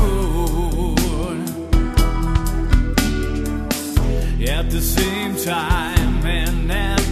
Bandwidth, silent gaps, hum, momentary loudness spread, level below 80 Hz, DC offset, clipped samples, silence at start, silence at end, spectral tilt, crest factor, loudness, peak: 14 kHz; none; none; 4 LU; -20 dBFS; under 0.1%; under 0.1%; 0 s; 0 s; -5 dB/octave; 18 dB; -20 LUFS; 0 dBFS